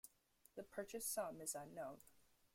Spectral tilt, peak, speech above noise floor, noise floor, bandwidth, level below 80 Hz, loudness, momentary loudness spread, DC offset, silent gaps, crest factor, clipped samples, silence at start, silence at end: -2.5 dB/octave; -32 dBFS; 27 dB; -76 dBFS; 16.5 kHz; -82 dBFS; -49 LUFS; 16 LU; under 0.1%; none; 20 dB; under 0.1%; 0.05 s; 0.3 s